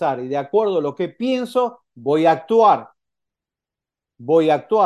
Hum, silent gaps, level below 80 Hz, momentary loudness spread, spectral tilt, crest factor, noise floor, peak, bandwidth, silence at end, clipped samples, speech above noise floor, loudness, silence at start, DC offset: none; none; -74 dBFS; 10 LU; -6.5 dB/octave; 16 dB; -88 dBFS; -2 dBFS; 12 kHz; 0 s; under 0.1%; 70 dB; -19 LUFS; 0 s; under 0.1%